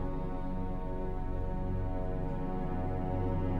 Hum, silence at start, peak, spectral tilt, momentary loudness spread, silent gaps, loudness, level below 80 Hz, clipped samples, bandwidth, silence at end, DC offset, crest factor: none; 0 s; -22 dBFS; -10 dB/octave; 4 LU; none; -37 LUFS; -36 dBFS; under 0.1%; 4.1 kHz; 0 s; under 0.1%; 12 dB